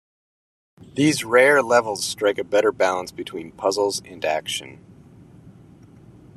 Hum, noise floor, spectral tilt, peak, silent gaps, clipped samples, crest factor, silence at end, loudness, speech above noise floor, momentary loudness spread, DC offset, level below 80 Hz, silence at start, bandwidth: none; -47 dBFS; -3.5 dB/octave; -2 dBFS; none; under 0.1%; 20 dB; 0.85 s; -20 LUFS; 27 dB; 15 LU; under 0.1%; -62 dBFS; 0.95 s; 13.5 kHz